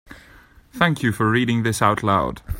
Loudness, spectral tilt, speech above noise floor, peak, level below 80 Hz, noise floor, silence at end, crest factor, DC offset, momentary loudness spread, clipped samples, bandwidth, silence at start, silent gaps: -20 LUFS; -5.5 dB/octave; 29 dB; 0 dBFS; -40 dBFS; -49 dBFS; 0 s; 20 dB; under 0.1%; 2 LU; under 0.1%; 16.5 kHz; 0.1 s; none